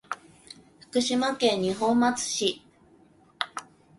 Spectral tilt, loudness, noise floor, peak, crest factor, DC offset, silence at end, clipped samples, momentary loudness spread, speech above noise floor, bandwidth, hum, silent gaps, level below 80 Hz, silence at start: -3 dB/octave; -26 LUFS; -58 dBFS; -6 dBFS; 22 dB; under 0.1%; 0.35 s; under 0.1%; 24 LU; 33 dB; 11.5 kHz; none; none; -66 dBFS; 0.1 s